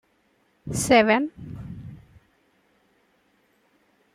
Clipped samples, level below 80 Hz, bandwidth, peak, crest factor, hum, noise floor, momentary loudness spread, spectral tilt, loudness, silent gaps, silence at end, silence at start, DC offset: under 0.1%; -54 dBFS; 15.5 kHz; -4 dBFS; 24 dB; none; -66 dBFS; 25 LU; -4 dB/octave; -21 LUFS; none; 2.2 s; 0.65 s; under 0.1%